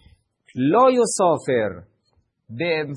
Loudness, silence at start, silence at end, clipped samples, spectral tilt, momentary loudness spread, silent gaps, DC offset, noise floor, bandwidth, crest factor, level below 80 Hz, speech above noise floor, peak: -20 LUFS; 0.55 s; 0 s; under 0.1%; -5 dB/octave; 21 LU; none; under 0.1%; -67 dBFS; 10.5 kHz; 16 dB; -64 dBFS; 48 dB; -4 dBFS